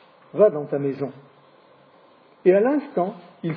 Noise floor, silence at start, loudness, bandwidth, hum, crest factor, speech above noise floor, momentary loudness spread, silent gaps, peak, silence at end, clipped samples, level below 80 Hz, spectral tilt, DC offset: -54 dBFS; 0.35 s; -22 LUFS; 5 kHz; none; 20 dB; 33 dB; 14 LU; none; -4 dBFS; 0 s; under 0.1%; -80 dBFS; -11.5 dB/octave; under 0.1%